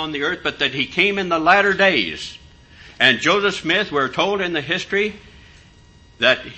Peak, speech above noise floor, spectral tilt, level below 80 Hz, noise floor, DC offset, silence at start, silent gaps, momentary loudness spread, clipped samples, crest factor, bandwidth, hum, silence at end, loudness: 0 dBFS; 29 dB; -3.5 dB/octave; -50 dBFS; -48 dBFS; under 0.1%; 0 s; none; 8 LU; under 0.1%; 20 dB; 8.6 kHz; none; 0 s; -18 LUFS